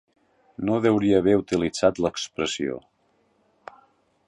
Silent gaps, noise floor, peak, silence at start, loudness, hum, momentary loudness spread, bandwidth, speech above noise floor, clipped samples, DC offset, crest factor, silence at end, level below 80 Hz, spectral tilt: none; -66 dBFS; -6 dBFS; 0.6 s; -23 LUFS; none; 11 LU; 11 kHz; 44 dB; under 0.1%; under 0.1%; 20 dB; 1.5 s; -54 dBFS; -5.5 dB/octave